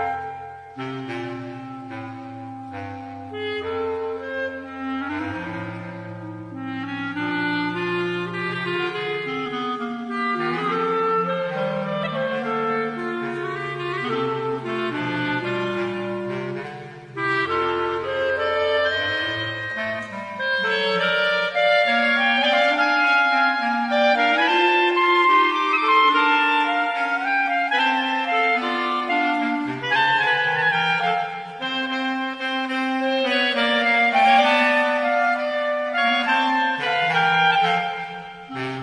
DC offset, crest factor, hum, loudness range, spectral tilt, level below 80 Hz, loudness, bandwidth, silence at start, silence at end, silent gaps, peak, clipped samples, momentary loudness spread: under 0.1%; 16 dB; none; 11 LU; -5 dB/octave; -64 dBFS; -21 LUFS; 10.5 kHz; 0 s; 0 s; none; -6 dBFS; under 0.1%; 15 LU